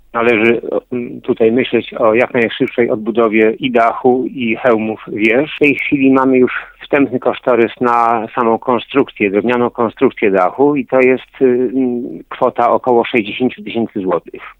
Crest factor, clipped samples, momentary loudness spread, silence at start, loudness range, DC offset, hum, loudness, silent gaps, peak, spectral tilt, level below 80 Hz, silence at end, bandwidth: 14 dB; under 0.1%; 7 LU; 0.15 s; 1 LU; under 0.1%; none; -14 LUFS; none; 0 dBFS; -7.5 dB/octave; -52 dBFS; 0.05 s; 6.2 kHz